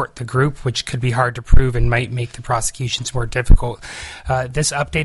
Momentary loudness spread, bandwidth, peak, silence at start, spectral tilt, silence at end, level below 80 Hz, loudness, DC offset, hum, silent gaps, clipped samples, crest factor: 8 LU; 11.5 kHz; 0 dBFS; 0 s; -4.5 dB/octave; 0 s; -20 dBFS; -20 LUFS; under 0.1%; none; none; under 0.1%; 16 dB